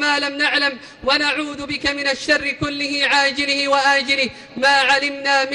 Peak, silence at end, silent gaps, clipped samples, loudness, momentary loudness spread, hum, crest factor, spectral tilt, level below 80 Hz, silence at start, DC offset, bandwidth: -4 dBFS; 0 s; none; under 0.1%; -17 LUFS; 7 LU; none; 14 dB; -2 dB/octave; -50 dBFS; 0 s; under 0.1%; 11.5 kHz